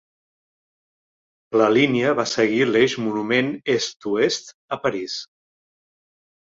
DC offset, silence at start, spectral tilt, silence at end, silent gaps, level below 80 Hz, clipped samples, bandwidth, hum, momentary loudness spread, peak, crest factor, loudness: under 0.1%; 1.5 s; -4.5 dB/octave; 1.25 s; 4.54-4.68 s; -64 dBFS; under 0.1%; 7.8 kHz; none; 11 LU; -2 dBFS; 20 dB; -21 LUFS